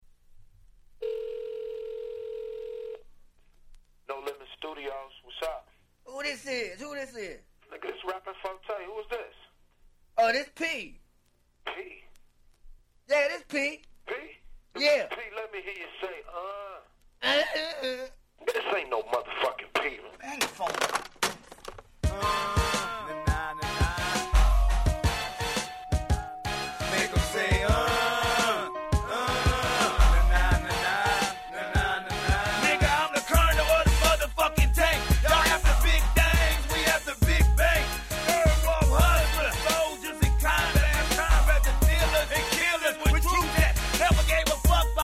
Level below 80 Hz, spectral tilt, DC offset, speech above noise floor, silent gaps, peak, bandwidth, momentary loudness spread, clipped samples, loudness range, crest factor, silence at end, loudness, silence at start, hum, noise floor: -30 dBFS; -4 dB/octave; under 0.1%; 35 dB; none; -8 dBFS; 16 kHz; 16 LU; under 0.1%; 15 LU; 18 dB; 0 s; -26 LUFS; 1 s; 60 Hz at -45 dBFS; -66 dBFS